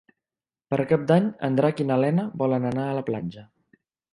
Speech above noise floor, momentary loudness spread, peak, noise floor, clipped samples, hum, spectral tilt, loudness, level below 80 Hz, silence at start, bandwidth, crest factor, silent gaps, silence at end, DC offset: over 67 dB; 8 LU; -6 dBFS; under -90 dBFS; under 0.1%; none; -9 dB/octave; -24 LUFS; -64 dBFS; 0.7 s; 10.5 kHz; 20 dB; none; 0.7 s; under 0.1%